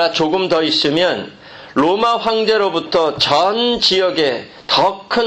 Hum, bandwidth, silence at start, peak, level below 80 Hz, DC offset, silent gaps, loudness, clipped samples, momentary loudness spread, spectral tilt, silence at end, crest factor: none; 9 kHz; 0 s; -2 dBFS; -52 dBFS; under 0.1%; none; -15 LUFS; under 0.1%; 5 LU; -4 dB/octave; 0 s; 14 dB